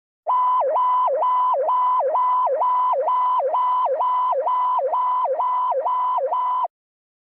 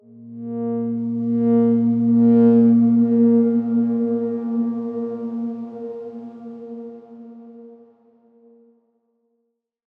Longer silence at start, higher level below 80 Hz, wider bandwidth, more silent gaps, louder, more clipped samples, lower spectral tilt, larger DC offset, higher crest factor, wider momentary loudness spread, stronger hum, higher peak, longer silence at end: about the same, 0.25 s vs 0.15 s; second, under -90 dBFS vs -80 dBFS; first, 3.8 kHz vs 2.2 kHz; neither; about the same, -20 LUFS vs -18 LUFS; neither; second, -3.5 dB/octave vs -12.5 dB/octave; neither; second, 8 dB vs 14 dB; second, 3 LU vs 22 LU; neither; second, -14 dBFS vs -6 dBFS; second, 0.55 s vs 2.25 s